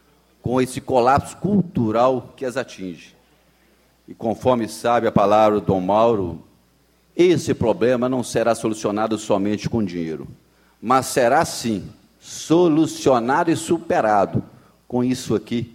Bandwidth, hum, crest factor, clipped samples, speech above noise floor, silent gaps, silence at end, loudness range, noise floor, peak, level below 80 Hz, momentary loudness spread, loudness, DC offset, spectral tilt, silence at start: 16 kHz; none; 18 dB; under 0.1%; 39 dB; none; 0.05 s; 4 LU; -59 dBFS; -2 dBFS; -52 dBFS; 12 LU; -20 LUFS; under 0.1%; -6 dB/octave; 0.45 s